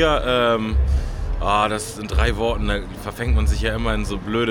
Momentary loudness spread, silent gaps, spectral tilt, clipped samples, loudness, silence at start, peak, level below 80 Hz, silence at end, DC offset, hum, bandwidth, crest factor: 8 LU; none; -5.5 dB/octave; under 0.1%; -21 LUFS; 0 s; -4 dBFS; -24 dBFS; 0 s; under 0.1%; none; 15.5 kHz; 16 dB